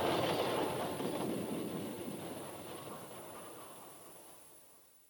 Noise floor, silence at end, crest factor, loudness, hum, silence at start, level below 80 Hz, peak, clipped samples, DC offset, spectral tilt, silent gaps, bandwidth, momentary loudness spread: -62 dBFS; 0.05 s; 18 dB; -40 LUFS; none; 0 s; -76 dBFS; -22 dBFS; under 0.1%; under 0.1%; -4.5 dB/octave; none; over 20 kHz; 19 LU